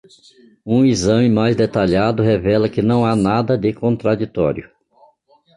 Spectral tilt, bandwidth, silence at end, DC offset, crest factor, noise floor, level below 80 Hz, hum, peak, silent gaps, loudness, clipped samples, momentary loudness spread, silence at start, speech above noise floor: -7 dB/octave; 11.5 kHz; 0.9 s; under 0.1%; 14 dB; -55 dBFS; -42 dBFS; none; -2 dBFS; none; -16 LUFS; under 0.1%; 5 LU; 0.65 s; 39 dB